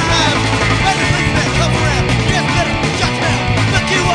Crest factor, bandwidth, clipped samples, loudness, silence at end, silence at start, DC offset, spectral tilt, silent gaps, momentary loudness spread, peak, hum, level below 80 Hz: 14 dB; 10 kHz; under 0.1%; -14 LUFS; 0 s; 0 s; under 0.1%; -4.5 dB/octave; none; 2 LU; 0 dBFS; none; -26 dBFS